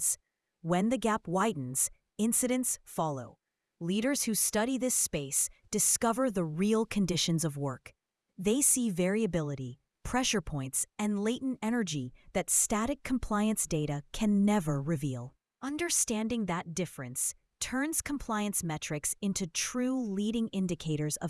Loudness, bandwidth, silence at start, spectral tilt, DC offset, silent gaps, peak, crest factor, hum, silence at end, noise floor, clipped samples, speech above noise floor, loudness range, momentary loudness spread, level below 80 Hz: -30 LUFS; 12 kHz; 0 s; -4 dB/octave; under 0.1%; none; -12 dBFS; 20 dB; none; 0 s; -60 dBFS; under 0.1%; 29 dB; 4 LU; 10 LU; -54 dBFS